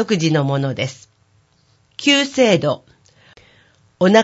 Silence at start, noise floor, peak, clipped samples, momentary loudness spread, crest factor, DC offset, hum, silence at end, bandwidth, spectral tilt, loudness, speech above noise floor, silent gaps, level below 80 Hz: 0 s; -58 dBFS; 0 dBFS; under 0.1%; 12 LU; 18 dB; under 0.1%; none; 0 s; 8 kHz; -5 dB/octave; -17 LUFS; 41 dB; none; -60 dBFS